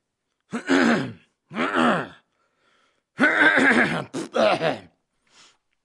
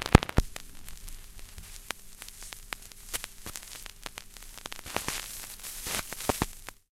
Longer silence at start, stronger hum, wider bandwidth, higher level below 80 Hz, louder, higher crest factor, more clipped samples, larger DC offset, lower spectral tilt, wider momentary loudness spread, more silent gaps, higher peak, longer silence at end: first, 0.5 s vs 0 s; neither; second, 11.5 kHz vs 17 kHz; second, -70 dBFS vs -40 dBFS; first, -20 LUFS vs -34 LUFS; second, 18 dB vs 34 dB; neither; neither; about the same, -4.5 dB/octave vs -4 dB/octave; first, 19 LU vs 15 LU; neither; second, -4 dBFS vs 0 dBFS; first, 1.05 s vs 0.2 s